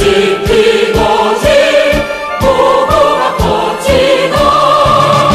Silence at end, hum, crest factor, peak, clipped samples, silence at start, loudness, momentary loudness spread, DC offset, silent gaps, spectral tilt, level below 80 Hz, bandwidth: 0 s; none; 8 dB; 0 dBFS; under 0.1%; 0 s; -9 LUFS; 4 LU; under 0.1%; none; -4.5 dB/octave; -26 dBFS; 15.5 kHz